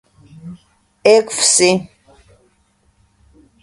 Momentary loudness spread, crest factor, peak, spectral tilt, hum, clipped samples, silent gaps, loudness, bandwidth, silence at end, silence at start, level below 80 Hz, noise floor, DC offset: 26 LU; 18 dB; 0 dBFS; -2.5 dB/octave; none; under 0.1%; none; -13 LUFS; 11.5 kHz; 1.75 s; 0.45 s; -56 dBFS; -59 dBFS; under 0.1%